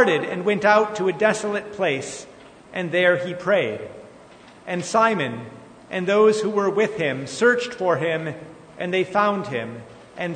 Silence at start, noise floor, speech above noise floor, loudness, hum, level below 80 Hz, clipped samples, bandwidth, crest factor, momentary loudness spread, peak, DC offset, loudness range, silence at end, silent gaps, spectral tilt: 0 s; -46 dBFS; 25 dB; -21 LUFS; none; -64 dBFS; under 0.1%; 9.6 kHz; 20 dB; 17 LU; -4 dBFS; under 0.1%; 3 LU; 0 s; none; -5 dB/octave